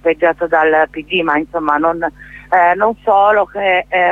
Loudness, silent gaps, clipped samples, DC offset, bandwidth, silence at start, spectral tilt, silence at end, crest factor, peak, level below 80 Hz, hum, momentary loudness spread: -14 LUFS; none; under 0.1%; under 0.1%; 7.4 kHz; 0.05 s; -6 dB/octave; 0 s; 12 dB; 0 dBFS; -46 dBFS; 50 Hz at -45 dBFS; 6 LU